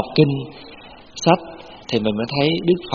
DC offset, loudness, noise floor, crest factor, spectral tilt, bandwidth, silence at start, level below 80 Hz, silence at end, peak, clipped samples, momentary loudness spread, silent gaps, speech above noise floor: under 0.1%; -20 LUFS; -39 dBFS; 20 dB; -5 dB/octave; 7.2 kHz; 0 s; -52 dBFS; 0 s; 0 dBFS; under 0.1%; 20 LU; none; 20 dB